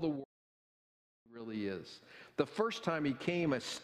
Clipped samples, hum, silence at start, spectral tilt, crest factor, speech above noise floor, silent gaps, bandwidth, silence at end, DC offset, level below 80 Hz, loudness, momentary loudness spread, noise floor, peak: under 0.1%; none; 0 s; -5.5 dB/octave; 22 dB; over 53 dB; 0.25-1.26 s; 13.5 kHz; 0 s; under 0.1%; -74 dBFS; -37 LUFS; 18 LU; under -90 dBFS; -16 dBFS